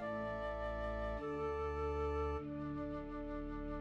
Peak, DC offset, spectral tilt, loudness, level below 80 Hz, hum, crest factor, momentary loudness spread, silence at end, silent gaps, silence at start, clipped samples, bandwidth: -28 dBFS; under 0.1%; -8 dB/octave; -42 LUFS; -48 dBFS; none; 12 dB; 6 LU; 0 s; none; 0 s; under 0.1%; 8.4 kHz